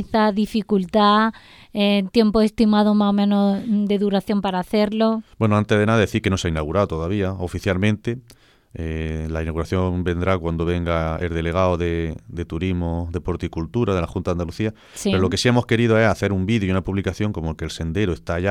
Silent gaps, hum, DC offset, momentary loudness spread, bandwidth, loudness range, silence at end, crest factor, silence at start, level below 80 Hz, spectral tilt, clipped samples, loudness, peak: none; none; under 0.1%; 10 LU; 13 kHz; 6 LU; 0 s; 18 dB; 0 s; -38 dBFS; -6.5 dB/octave; under 0.1%; -21 LUFS; -2 dBFS